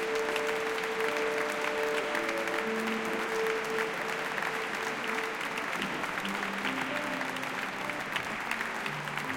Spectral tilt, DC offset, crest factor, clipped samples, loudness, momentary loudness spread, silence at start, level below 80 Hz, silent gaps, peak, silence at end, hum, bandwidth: -3 dB/octave; under 0.1%; 18 dB; under 0.1%; -32 LUFS; 3 LU; 0 s; -66 dBFS; none; -14 dBFS; 0 s; none; 17 kHz